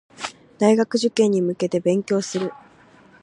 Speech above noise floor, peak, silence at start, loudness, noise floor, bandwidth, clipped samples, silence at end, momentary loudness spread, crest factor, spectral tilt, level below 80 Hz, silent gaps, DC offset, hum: 31 dB; -4 dBFS; 0.2 s; -21 LUFS; -51 dBFS; 11 kHz; under 0.1%; 0.7 s; 14 LU; 18 dB; -5.5 dB/octave; -68 dBFS; none; under 0.1%; none